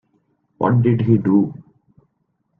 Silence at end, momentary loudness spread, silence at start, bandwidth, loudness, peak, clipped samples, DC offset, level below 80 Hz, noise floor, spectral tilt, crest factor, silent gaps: 1.05 s; 7 LU; 0.6 s; 3.4 kHz; -17 LUFS; -2 dBFS; under 0.1%; under 0.1%; -54 dBFS; -69 dBFS; -12 dB/octave; 18 dB; none